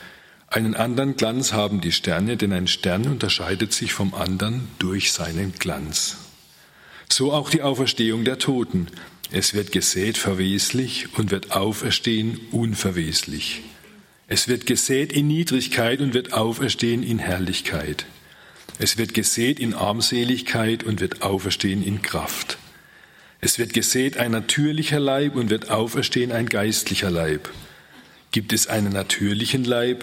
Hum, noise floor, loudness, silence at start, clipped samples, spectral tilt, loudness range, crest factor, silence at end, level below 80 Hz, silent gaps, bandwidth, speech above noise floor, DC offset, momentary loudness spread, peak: none; -51 dBFS; -22 LUFS; 0 s; under 0.1%; -3.5 dB/octave; 2 LU; 20 dB; 0 s; -54 dBFS; none; 16.5 kHz; 29 dB; under 0.1%; 6 LU; -2 dBFS